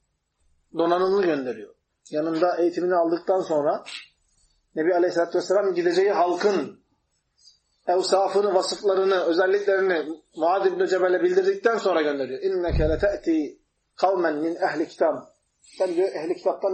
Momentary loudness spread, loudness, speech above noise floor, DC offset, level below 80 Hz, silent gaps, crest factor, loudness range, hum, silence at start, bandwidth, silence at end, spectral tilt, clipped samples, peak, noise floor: 8 LU; -23 LUFS; 49 dB; under 0.1%; -44 dBFS; none; 16 dB; 3 LU; none; 0.75 s; 8.8 kHz; 0 s; -5.5 dB/octave; under 0.1%; -8 dBFS; -71 dBFS